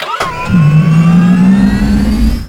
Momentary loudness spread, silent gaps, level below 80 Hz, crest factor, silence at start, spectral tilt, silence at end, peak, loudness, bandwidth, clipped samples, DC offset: 5 LU; none; -18 dBFS; 8 dB; 0 s; -7.5 dB/octave; 0 s; 0 dBFS; -9 LUFS; 13 kHz; under 0.1%; under 0.1%